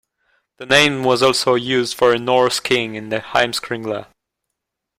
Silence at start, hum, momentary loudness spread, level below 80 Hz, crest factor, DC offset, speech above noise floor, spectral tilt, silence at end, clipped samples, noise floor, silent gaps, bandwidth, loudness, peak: 0.6 s; none; 11 LU; -56 dBFS; 18 dB; under 0.1%; 62 dB; -3.5 dB/octave; 0.95 s; under 0.1%; -79 dBFS; none; 16 kHz; -17 LUFS; 0 dBFS